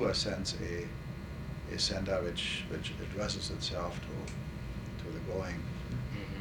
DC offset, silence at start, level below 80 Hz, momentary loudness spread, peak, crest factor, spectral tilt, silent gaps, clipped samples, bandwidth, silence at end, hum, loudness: under 0.1%; 0 s; -46 dBFS; 9 LU; -20 dBFS; 18 dB; -4.5 dB/octave; none; under 0.1%; 19 kHz; 0 s; none; -37 LUFS